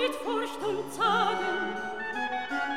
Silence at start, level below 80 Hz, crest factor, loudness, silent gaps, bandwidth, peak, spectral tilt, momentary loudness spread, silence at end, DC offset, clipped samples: 0 s; -66 dBFS; 16 dB; -30 LUFS; none; 16.5 kHz; -14 dBFS; -3.5 dB/octave; 7 LU; 0 s; 0.4%; under 0.1%